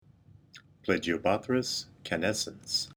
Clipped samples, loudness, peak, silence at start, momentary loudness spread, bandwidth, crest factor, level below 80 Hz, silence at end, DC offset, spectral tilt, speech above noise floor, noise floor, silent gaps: under 0.1%; -31 LUFS; -12 dBFS; 0.55 s; 7 LU; over 20 kHz; 20 dB; -62 dBFS; 0.05 s; under 0.1%; -3.5 dB/octave; 27 dB; -58 dBFS; none